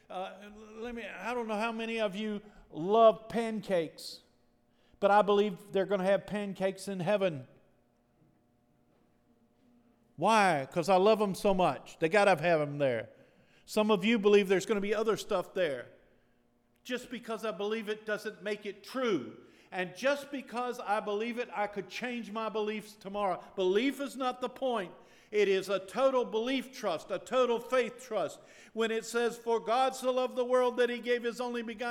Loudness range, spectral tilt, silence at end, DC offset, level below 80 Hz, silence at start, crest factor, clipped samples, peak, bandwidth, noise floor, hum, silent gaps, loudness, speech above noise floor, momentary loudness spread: 8 LU; -5 dB/octave; 0 s; under 0.1%; -64 dBFS; 0.1 s; 20 dB; under 0.1%; -12 dBFS; 16.5 kHz; -70 dBFS; none; none; -31 LUFS; 39 dB; 14 LU